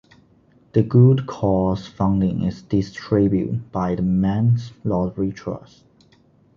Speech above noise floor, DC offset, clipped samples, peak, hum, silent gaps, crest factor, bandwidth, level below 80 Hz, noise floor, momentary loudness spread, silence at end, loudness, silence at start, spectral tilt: 36 dB; under 0.1%; under 0.1%; -2 dBFS; none; none; 18 dB; 7 kHz; -42 dBFS; -55 dBFS; 10 LU; 1 s; -20 LUFS; 0.75 s; -9.5 dB/octave